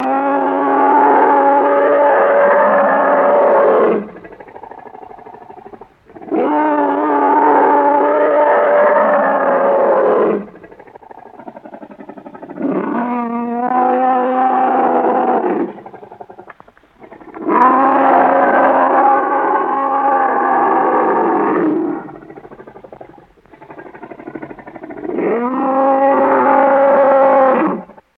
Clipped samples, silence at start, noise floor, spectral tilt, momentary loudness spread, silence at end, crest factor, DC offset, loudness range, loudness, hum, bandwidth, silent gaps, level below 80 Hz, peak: under 0.1%; 0 s; -46 dBFS; -8.5 dB/octave; 20 LU; 0.25 s; 14 dB; under 0.1%; 9 LU; -13 LUFS; none; 4.2 kHz; none; -62 dBFS; 0 dBFS